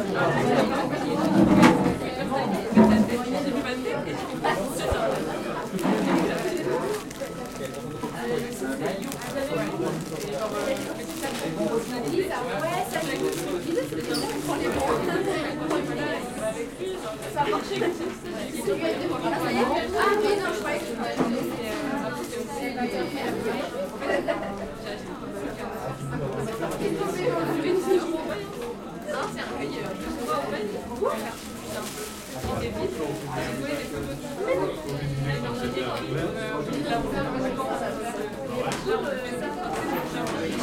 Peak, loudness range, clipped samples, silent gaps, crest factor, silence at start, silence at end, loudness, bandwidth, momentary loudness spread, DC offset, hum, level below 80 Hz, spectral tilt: -2 dBFS; 6 LU; under 0.1%; none; 24 dB; 0 s; 0 s; -27 LUFS; 17 kHz; 9 LU; under 0.1%; none; -50 dBFS; -5.5 dB/octave